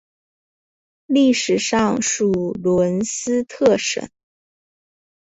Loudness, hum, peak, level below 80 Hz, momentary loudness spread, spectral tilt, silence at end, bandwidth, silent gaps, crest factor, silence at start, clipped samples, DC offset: -19 LUFS; none; -4 dBFS; -54 dBFS; 6 LU; -4 dB/octave; 1.15 s; 8.2 kHz; none; 18 dB; 1.1 s; under 0.1%; under 0.1%